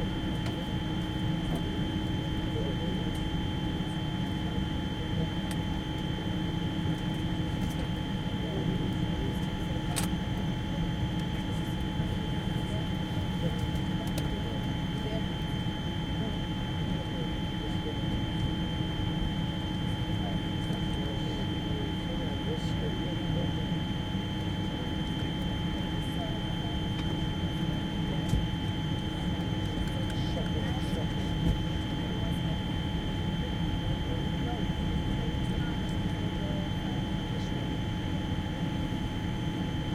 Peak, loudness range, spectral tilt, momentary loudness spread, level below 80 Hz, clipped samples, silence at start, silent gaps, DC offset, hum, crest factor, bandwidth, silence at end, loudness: -14 dBFS; 1 LU; -6.5 dB/octave; 2 LU; -40 dBFS; under 0.1%; 0 s; none; under 0.1%; none; 16 dB; 16 kHz; 0 s; -32 LUFS